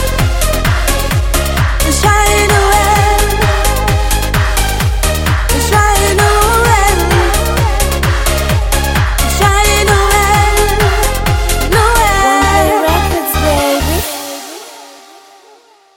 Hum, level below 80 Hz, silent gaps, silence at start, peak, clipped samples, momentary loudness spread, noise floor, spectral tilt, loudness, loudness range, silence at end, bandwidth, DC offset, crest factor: none; -16 dBFS; none; 0 s; 0 dBFS; under 0.1%; 5 LU; -44 dBFS; -4 dB/octave; -11 LUFS; 2 LU; 1 s; 17.5 kHz; under 0.1%; 10 dB